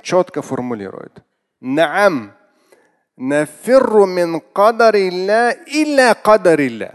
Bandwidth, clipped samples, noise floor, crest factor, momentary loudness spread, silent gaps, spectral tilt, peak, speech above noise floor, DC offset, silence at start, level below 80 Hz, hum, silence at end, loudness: 12.5 kHz; under 0.1%; -54 dBFS; 16 dB; 14 LU; none; -5 dB/octave; 0 dBFS; 40 dB; under 0.1%; 0.05 s; -62 dBFS; none; 0.05 s; -14 LUFS